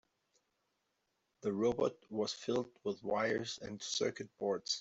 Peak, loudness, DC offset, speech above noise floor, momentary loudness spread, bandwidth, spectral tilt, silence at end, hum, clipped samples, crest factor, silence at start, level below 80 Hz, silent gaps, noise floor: -22 dBFS; -38 LUFS; under 0.1%; 46 dB; 7 LU; 8.2 kHz; -3.5 dB/octave; 0 s; none; under 0.1%; 18 dB; 1.45 s; -74 dBFS; none; -83 dBFS